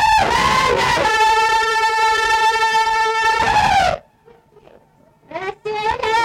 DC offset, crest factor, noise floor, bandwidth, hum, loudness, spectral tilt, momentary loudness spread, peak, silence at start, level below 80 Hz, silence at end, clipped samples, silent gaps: under 0.1%; 10 dB; -53 dBFS; 16.5 kHz; none; -15 LUFS; -2 dB/octave; 11 LU; -6 dBFS; 0 s; -40 dBFS; 0 s; under 0.1%; none